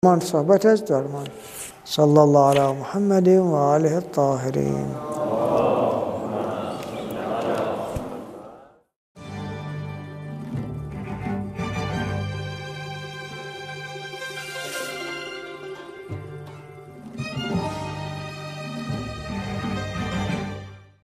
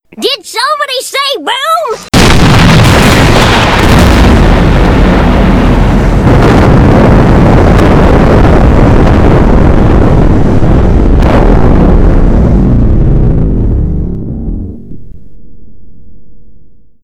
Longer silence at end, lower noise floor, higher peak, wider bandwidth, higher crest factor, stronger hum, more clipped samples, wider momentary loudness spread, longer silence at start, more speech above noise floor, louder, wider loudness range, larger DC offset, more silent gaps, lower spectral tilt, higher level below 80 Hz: about the same, 0.2 s vs 0.3 s; first, -48 dBFS vs -36 dBFS; about the same, -2 dBFS vs 0 dBFS; about the same, 15.5 kHz vs 16 kHz; first, 22 dB vs 4 dB; neither; second, under 0.1% vs 7%; first, 18 LU vs 7 LU; about the same, 0.05 s vs 0.15 s; first, 29 dB vs 25 dB; second, -24 LUFS vs -6 LUFS; first, 14 LU vs 7 LU; neither; first, 8.96-9.15 s vs none; about the same, -6.5 dB/octave vs -6.5 dB/octave; second, -50 dBFS vs -10 dBFS